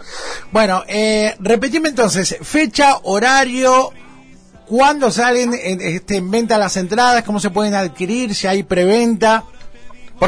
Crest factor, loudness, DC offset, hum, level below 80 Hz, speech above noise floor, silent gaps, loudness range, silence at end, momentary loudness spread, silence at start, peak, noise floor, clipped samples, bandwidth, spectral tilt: 14 dB; -15 LUFS; under 0.1%; none; -44 dBFS; 28 dB; none; 2 LU; 0 s; 7 LU; 0 s; -2 dBFS; -42 dBFS; under 0.1%; 11 kHz; -4 dB/octave